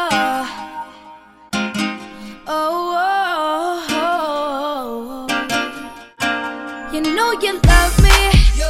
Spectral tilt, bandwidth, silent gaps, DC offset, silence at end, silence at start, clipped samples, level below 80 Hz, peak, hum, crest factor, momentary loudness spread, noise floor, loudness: -4.5 dB/octave; 16 kHz; none; 0.1%; 0 s; 0 s; under 0.1%; -22 dBFS; 0 dBFS; none; 18 dB; 17 LU; -42 dBFS; -18 LUFS